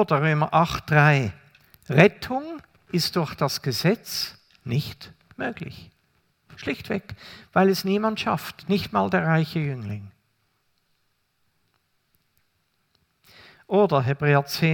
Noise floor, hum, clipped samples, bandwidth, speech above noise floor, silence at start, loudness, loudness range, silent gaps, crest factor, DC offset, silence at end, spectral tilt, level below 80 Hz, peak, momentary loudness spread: -70 dBFS; none; under 0.1%; 18 kHz; 48 dB; 0 s; -23 LUFS; 9 LU; none; 24 dB; under 0.1%; 0 s; -6 dB/octave; -58 dBFS; 0 dBFS; 18 LU